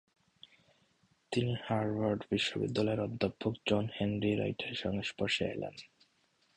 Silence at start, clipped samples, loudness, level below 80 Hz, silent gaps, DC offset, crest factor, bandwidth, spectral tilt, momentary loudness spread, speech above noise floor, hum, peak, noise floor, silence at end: 1.3 s; under 0.1%; -34 LUFS; -62 dBFS; none; under 0.1%; 20 dB; 10.5 kHz; -6 dB/octave; 5 LU; 39 dB; none; -16 dBFS; -73 dBFS; 0.7 s